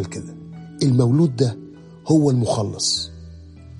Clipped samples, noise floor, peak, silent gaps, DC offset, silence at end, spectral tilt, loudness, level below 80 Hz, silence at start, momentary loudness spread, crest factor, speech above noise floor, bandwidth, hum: under 0.1%; -40 dBFS; -4 dBFS; none; under 0.1%; 0 s; -6 dB/octave; -19 LUFS; -50 dBFS; 0 s; 20 LU; 16 dB; 21 dB; 11.5 kHz; none